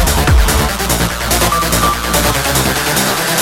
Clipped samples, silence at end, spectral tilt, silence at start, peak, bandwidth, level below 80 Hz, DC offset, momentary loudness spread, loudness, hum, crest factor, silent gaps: under 0.1%; 0 s; -3 dB/octave; 0 s; -2 dBFS; 17 kHz; -18 dBFS; under 0.1%; 3 LU; -13 LUFS; none; 12 dB; none